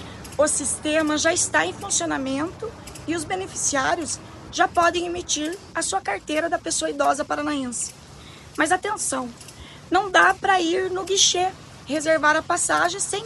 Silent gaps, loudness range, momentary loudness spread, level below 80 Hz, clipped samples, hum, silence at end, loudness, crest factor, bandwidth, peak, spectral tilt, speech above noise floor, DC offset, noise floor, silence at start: none; 5 LU; 14 LU; -52 dBFS; under 0.1%; none; 0 s; -22 LUFS; 20 dB; 13 kHz; -2 dBFS; -1.5 dB/octave; 20 dB; under 0.1%; -43 dBFS; 0 s